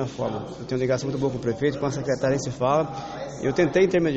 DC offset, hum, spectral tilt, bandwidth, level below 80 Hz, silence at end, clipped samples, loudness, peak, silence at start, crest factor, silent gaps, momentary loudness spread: under 0.1%; none; -6 dB/octave; 8.2 kHz; -52 dBFS; 0 s; under 0.1%; -25 LUFS; -8 dBFS; 0 s; 16 dB; none; 10 LU